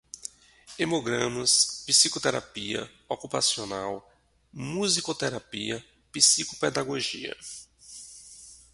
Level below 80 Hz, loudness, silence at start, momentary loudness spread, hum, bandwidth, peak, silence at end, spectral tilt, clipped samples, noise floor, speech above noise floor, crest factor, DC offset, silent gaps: -64 dBFS; -25 LUFS; 0.15 s; 23 LU; none; 12 kHz; -4 dBFS; 0.15 s; -1.5 dB/octave; under 0.1%; -52 dBFS; 24 dB; 26 dB; under 0.1%; none